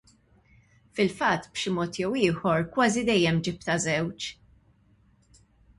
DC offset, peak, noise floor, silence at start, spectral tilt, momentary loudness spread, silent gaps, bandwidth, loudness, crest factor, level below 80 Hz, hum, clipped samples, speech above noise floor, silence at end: under 0.1%; -10 dBFS; -62 dBFS; 0.95 s; -4.5 dB/octave; 8 LU; none; 11.5 kHz; -26 LUFS; 18 dB; -58 dBFS; none; under 0.1%; 36 dB; 1.45 s